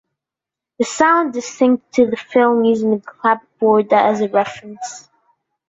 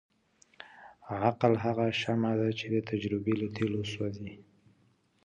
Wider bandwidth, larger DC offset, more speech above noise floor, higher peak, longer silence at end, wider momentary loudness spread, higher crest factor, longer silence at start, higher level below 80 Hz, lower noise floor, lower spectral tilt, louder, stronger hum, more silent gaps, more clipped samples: second, 8 kHz vs 9 kHz; neither; first, 71 dB vs 38 dB; first, -2 dBFS vs -10 dBFS; second, 0.7 s vs 0.85 s; second, 11 LU vs 22 LU; second, 16 dB vs 22 dB; first, 0.8 s vs 0.6 s; about the same, -62 dBFS vs -62 dBFS; first, -86 dBFS vs -69 dBFS; second, -5 dB/octave vs -7 dB/octave; first, -16 LUFS vs -31 LUFS; neither; neither; neither